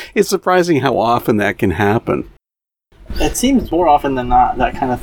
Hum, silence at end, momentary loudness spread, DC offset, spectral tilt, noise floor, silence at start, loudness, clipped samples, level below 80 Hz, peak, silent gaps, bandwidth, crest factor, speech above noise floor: none; 0 s; 8 LU; under 0.1%; -5 dB/octave; -88 dBFS; 0 s; -15 LUFS; under 0.1%; -30 dBFS; 0 dBFS; none; 19.5 kHz; 16 dB; 73 dB